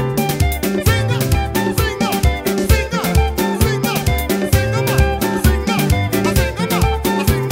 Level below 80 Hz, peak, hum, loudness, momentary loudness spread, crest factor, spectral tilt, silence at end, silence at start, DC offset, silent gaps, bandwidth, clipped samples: -22 dBFS; 0 dBFS; none; -17 LUFS; 2 LU; 16 dB; -5.5 dB/octave; 0 s; 0 s; under 0.1%; none; 16.5 kHz; under 0.1%